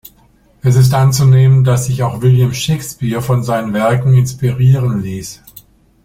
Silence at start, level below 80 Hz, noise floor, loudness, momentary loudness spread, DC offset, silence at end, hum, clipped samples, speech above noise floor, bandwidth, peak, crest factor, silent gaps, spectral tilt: 0.65 s; -42 dBFS; -49 dBFS; -12 LUFS; 10 LU; under 0.1%; 0.7 s; none; under 0.1%; 38 dB; 15.5 kHz; 0 dBFS; 12 dB; none; -6.5 dB/octave